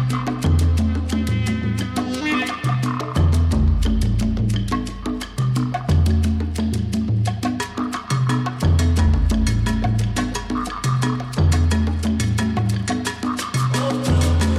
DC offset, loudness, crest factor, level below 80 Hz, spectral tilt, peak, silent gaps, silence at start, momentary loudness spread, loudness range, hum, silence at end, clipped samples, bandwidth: under 0.1%; -21 LUFS; 12 dB; -26 dBFS; -6 dB/octave; -8 dBFS; none; 0 s; 6 LU; 1 LU; none; 0 s; under 0.1%; 13.5 kHz